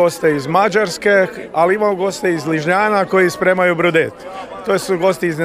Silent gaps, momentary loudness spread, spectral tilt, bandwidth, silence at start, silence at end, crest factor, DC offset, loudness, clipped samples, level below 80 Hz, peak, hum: none; 6 LU; -5 dB/octave; 16 kHz; 0 s; 0 s; 14 dB; under 0.1%; -15 LUFS; under 0.1%; -54 dBFS; -2 dBFS; none